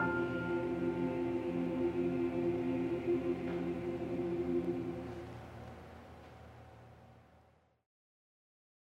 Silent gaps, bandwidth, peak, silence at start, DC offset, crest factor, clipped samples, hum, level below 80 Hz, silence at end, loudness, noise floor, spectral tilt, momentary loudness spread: none; 7.8 kHz; -24 dBFS; 0 s; under 0.1%; 14 dB; under 0.1%; none; -64 dBFS; 1.75 s; -37 LUFS; -68 dBFS; -8.5 dB/octave; 19 LU